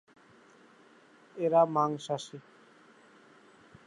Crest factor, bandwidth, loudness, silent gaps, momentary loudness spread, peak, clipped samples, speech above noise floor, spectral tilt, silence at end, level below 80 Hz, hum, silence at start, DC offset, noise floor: 22 dB; 11 kHz; -29 LUFS; none; 24 LU; -12 dBFS; under 0.1%; 31 dB; -6 dB/octave; 1.45 s; -84 dBFS; none; 1.35 s; under 0.1%; -59 dBFS